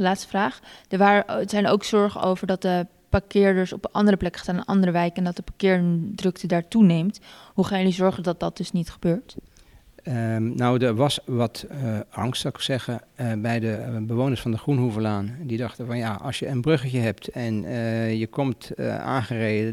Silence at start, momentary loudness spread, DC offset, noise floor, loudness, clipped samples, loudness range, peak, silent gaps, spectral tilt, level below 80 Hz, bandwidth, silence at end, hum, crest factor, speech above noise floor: 0 s; 9 LU; under 0.1%; -52 dBFS; -24 LUFS; under 0.1%; 4 LU; -6 dBFS; none; -6.5 dB/octave; -50 dBFS; 14 kHz; 0 s; none; 18 dB; 29 dB